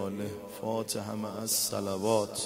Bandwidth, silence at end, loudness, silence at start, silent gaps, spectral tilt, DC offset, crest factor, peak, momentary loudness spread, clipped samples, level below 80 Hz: 16 kHz; 0 s; -32 LUFS; 0 s; none; -3.5 dB/octave; under 0.1%; 20 dB; -14 dBFS; 10 LU; under 0.1%; -70 dBFS